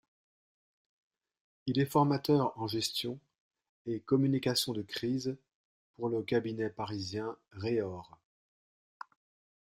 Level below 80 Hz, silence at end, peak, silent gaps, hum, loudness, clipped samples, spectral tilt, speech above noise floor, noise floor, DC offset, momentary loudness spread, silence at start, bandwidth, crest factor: -72 dBFS; 1.55 s; -14 dBFS; 3.40-3.51 s, 3.69-3.85 s, 5.54-5.94 s; none; -33 LUFS; under 0.1%; -5.5 dB/octave; over 58 dB; under -90 dBFS; under 0.1%; 18 LU; 1.65 s; 15.5 kHz; 22 dB